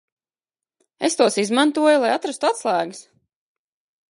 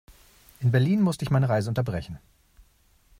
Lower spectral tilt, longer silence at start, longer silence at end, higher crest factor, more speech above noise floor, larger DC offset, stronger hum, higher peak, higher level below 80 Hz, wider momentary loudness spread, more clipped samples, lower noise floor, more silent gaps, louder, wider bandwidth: second, -3 dB/octave vs -7.5 dB/octave; first, 1 s vs 0.6 s; about the same, 1.1 s vs 1.05 s; about the same, 20 dB vs 16 dB; first, over 71 dB vs 38 dB; neither; neither; first, -2 dBFS vs -10 dBFS; second, -80 dBFS vs -52 dBFS; second, 7 LU vs 14 LU; neither; first, under -90 dBFS vs -61 dBFS; neither; first, -19 LUFS vs -25 LUFS; second, 11.5 kHz vs 15.5 kHz